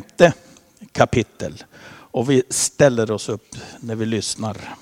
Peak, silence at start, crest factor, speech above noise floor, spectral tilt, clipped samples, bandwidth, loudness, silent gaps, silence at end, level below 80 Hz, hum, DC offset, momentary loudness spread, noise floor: 0 dBFS; 0 s; 20 dB; 26 dB; -4.5 dB/octave; under 0.1%; 16 kHz; -20 LUFS; none; 0.05 s; -50 dBFS; none; under 0.1%; 16 LU; -46 dBFS